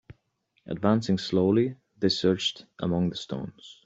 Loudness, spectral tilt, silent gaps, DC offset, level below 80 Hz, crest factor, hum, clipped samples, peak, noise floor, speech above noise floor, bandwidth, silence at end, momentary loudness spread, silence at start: -27 LUFS; -6 dB/octave; none; under 0.1%; -60 dBFS; 20 dB; none; under 0.1%; -8 dBFS; -73 dBFS; 46 dB; 8 kHz; 0.1 s; 12 LU; 0.1 s